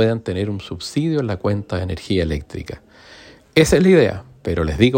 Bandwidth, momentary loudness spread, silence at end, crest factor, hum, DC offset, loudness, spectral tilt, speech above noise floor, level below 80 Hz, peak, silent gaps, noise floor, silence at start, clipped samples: 16.5 kHz; 16 LU; 0 s; 18 dB; none; under 0.1%; -19 LUFS; -6 dB/octave; 26 dB; -38 dBFS; 0 dBFS; none; -44 dBFS; 0 s; under 0.1%